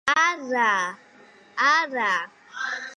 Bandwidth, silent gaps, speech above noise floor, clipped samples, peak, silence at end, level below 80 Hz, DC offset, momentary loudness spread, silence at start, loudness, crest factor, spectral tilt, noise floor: 11.5 kHz; none; 29 dB; under 0.1%; -8 dBFS; 0.05 s; -74 dBFS; under 0.1%; 12 LU; 0.05 s; -23 LUFS; 16 dB; -1 dB/octave; -52 dBFS